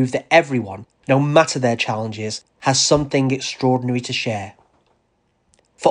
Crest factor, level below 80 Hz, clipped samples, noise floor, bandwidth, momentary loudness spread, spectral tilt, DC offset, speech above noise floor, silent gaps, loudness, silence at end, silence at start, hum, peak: 18 dB; -52 dBFS; under 0.1%; -65 dBFS; 10 kHz; 12 LU; -4.5 dB/octave; under 0.1%; 47 dB; none; -19 LUFS; 0 s; 0 s; none; 0 dBFS